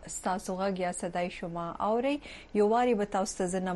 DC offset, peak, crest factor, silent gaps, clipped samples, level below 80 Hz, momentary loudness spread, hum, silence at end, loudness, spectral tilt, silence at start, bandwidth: under 0.1%; -16 dBFS; 14 dB; none; under 0.1%; -56 dBFS; 9 LU; none; 0 s; -31 LUFS; -5 dB/octave; 0 s; 12 kHz